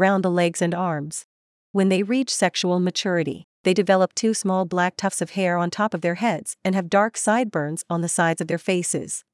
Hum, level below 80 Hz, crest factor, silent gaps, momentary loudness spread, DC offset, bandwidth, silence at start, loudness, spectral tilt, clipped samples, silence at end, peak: none; -74 dBFS; 16 dB; 1.24-1.74 s, 3.44-3.64 s; 6 LU; under 0.1%; 12 kHz; 0 s; -22 LUFS; -4.5 dB/octave; under 0.1%; 0.15 s; -6 dBFS